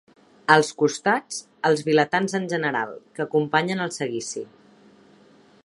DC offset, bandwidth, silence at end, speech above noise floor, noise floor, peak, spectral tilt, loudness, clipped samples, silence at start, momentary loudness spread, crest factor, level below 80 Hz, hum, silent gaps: under 0.1%; 11.5 kHz; 1.2 s; 32 dB; -54 dBFS; 0 dBFS; -4.5 dB/octave; -23 LUFS; under 0.1%; 0.5 s; 14 LU; 24 dB; -72 dBFS; none; none